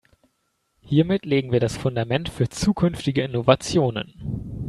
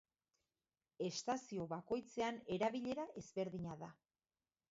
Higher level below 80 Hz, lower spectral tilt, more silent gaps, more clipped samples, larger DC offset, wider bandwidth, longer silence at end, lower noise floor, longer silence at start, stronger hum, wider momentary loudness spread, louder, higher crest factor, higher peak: first, -46 dBFS vs -76 dBFS; first, -6 dB/octave vs -4.5 dB/octave; neither; neither; neither; first, 13 kHz vs 7.6 kHz; second, 0 s vs 0.8 s; second, -71 dBFS vs under -90 dBFS; second, 0.85 s vs 1 s; neither; about the same, 9 LU vs 8 LU; first, -23 LUFS vs -44 LUFS; about the same, 22 dB vs 18 dB; first, 0 dBFS vs -26 dBFS